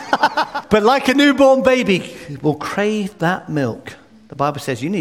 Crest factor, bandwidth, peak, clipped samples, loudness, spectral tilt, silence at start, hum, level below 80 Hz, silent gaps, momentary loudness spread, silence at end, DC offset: 16 dB; 16 kHz; 0 dBFS; under 0.1%; -17 LUFS; -5.5 dB/octave; 0 s; none; -50 dBFS; none; 11 LU; 0 s; 0.1%